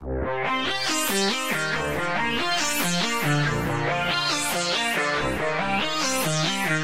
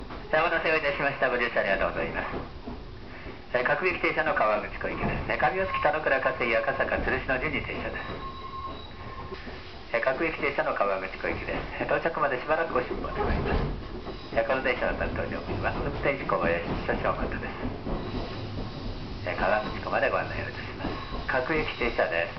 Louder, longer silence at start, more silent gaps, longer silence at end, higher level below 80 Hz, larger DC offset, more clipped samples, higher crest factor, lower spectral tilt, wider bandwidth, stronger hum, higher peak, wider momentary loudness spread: first, -23 LUFS vs -28 LUFS; about the same, 0 s vs 0 s; neither; about the same, 0 s vs 0 s; about the same, -44 dBFS vs -40 dBFS; about the same, 1% vs 0.5%; neither; about the same, 14 dB vs 18 dB; about the same, -3 dB/octave vs -3.5 dB/octave; first, 16 kHz vs 6.2 kHz; neither; about the same, -10 dBFS vs -10 dBFS; second, 3 LU vs 12 LU